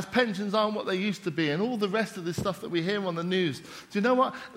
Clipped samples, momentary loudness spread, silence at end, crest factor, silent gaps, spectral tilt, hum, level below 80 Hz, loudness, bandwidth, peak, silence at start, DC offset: under 0.1%; 6 LU; 0 s; 20 dB; none; -5.5 dB/octave; none; -66 dBFS; -28 LUFS; 16 kHz; -8 dBFS; 0 s; under 0.1%